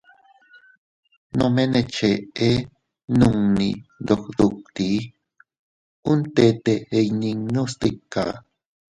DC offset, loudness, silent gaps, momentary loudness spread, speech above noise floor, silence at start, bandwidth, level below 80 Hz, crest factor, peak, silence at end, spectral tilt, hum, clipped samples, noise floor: under 0.1%; -22 LUFS; 5.59-6.03 s; 10 LU; 34 dB; 1.35 s; 11 kHz; -48 dBFS; 20 dB; -4 dBFS; 0.6 s; -6.5 dB/octave; none; under 0.1%; -54 dBFS